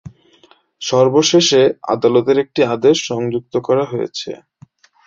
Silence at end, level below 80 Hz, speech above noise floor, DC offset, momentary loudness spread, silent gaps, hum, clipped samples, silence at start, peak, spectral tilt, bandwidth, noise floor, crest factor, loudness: 0.7 s; -58 dBFS; 37 dB; under 0.1%; 13 LU; none; none; under 0.1%; 0.05 s; -2 dBFS; -4.5 dB/octave; 7.8 kHz; -52 dBFS; 14 dB; -15 LUFS